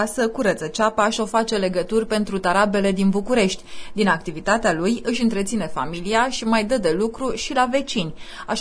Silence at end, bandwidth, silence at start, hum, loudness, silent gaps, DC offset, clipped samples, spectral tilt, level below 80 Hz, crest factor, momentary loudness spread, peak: 0 s; 11 kHz; 0 s; none; -21 LUFS; none; under 0.1%; under 0.1%; -4.5 dB/octave; -42 dBFS; 16 dB; 7 LU; -4 dBFS